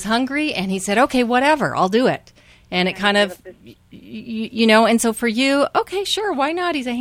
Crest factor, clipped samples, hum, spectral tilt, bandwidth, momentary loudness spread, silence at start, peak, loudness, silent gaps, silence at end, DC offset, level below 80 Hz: 18 dB; under 0.1%; 60 Hz at -45 dBFS; -4 dB/octave; 16.5 kHz; 12 LU; 0 s; -2 dBFS; -18 LUFS; none; 0 s; under 0.1%; -52 dBFS